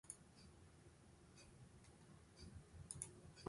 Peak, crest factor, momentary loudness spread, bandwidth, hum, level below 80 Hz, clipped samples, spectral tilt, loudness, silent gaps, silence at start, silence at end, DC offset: -28 dBFS; 32 dB; 14 LU; 11.5 kHz; none; -70 dBFS; under 0.1%; -4 dB/octave; -60 LUFS; none; 0.05 s; 0 s; under 0.1%